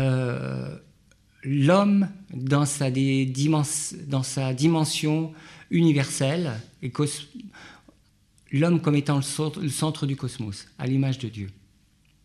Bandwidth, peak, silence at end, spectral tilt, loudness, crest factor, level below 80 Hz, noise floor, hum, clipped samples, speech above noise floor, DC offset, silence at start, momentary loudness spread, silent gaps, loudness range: 13.5 kHz; -8 dBFS; 0.7 s; -5.5 dB/octave; -25 LUFS; 18 dB; -62 dBFS; -61 dBFS; none; under 0.1%; 37 dB; under 0.1%; 0 s; 14 LU; none; 4 LU